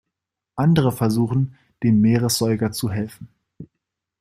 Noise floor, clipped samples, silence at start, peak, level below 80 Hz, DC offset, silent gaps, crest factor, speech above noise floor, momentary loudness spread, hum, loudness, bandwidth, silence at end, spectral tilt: -83 dBFS; under 0.1%; 0.55 s; -4 dBFS; -52 dBFS; under 0.1%; none; 16 dB; 64 dB; 11 LU; none; -20 LUFS; 16 kHz; 0.55 s; -6 dB/octave